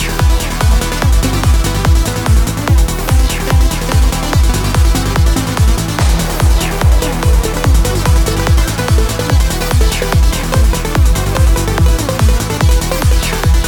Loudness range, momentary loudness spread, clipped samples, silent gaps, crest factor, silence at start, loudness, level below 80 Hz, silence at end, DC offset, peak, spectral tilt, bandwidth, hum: 0 LU; 1 LU; under 0.1%; none; 10 dB; 0 s; -13 LUFS; -12 dBFS; 0 s; 0.3%; 0 dBFS; -5 dB/octave; 19.5 kHz; none